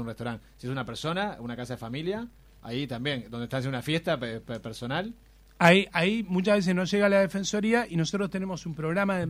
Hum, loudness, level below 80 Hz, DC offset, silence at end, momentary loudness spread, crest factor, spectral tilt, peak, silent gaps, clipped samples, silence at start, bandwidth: none; -28 LUFS; -56 dBFS; under 0.1%; 0 s; 14 LU; 24 dB; -5.5 dB/octave; -4 dBFS; none; under 0.1%; 0 s; 16 kHz